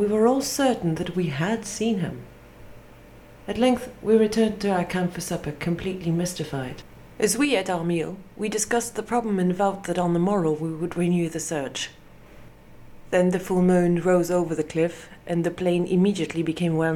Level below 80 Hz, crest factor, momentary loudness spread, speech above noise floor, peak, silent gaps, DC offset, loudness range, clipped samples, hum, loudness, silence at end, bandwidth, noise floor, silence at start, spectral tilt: -52 dBFS; 16 dB; 10 LU; 24 dB; -8 dBFS; none; under 0.1%; 4 LU; under 0.1%; none; -24 LUFS; 0 s; 17 kHz; -47 dBFS; 0 s; -5.5 dB/octave